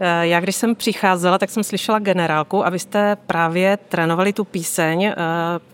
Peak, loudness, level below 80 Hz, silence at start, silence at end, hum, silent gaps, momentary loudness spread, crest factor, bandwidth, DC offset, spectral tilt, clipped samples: -2 dBFS; -18 LUFS; -66 dBFS; 0 s; 0.15 s; none; none; 4 LU; 16 dB; 17 kHz; under 0.1%; -4.5 dB/octave; under 0.1%